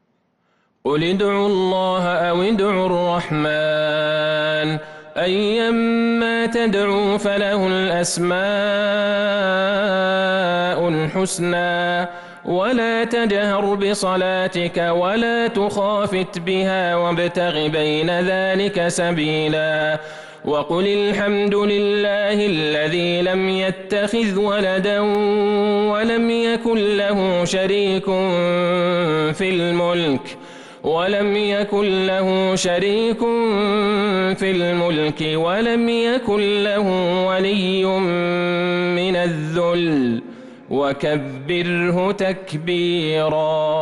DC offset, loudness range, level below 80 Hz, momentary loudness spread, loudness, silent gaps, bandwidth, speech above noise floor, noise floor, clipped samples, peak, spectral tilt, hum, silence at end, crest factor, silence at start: under 0.1%; 1 LU; -52 dBFS; 3 LU; -19 LUFS; none; 11.5 kHz; 47 dB; -65 dBFS; under 0.1%; -10 dBFS; -5 dB/octave; none; 0 s; 8 dB; 0.85 s